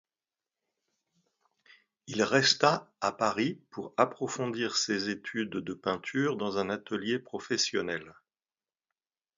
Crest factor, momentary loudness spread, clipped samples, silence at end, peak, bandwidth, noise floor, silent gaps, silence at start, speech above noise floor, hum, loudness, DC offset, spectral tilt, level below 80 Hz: 24 dB; 10 LU; under 0.1%; 1.25 s; -8 dBFS; 7.8 kHz; under -90 dBFS; none; 2.05 s; over 59 dB; none; -30 LUFS; under 0.1%; -3.5 dB/octave; -72 dBFS